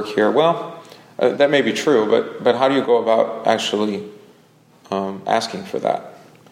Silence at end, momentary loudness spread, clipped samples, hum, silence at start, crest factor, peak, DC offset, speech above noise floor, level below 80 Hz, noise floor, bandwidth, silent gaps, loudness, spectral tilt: 0.35 s; 11 LU; under 0.1%; none; 0 s; 18 dB; -2 dBFS; under 0.1%; 34 dB; -68 dBFS; -52 dBFS; 14.5 kHz; none; -19 LUFS; -4.5 dB/octave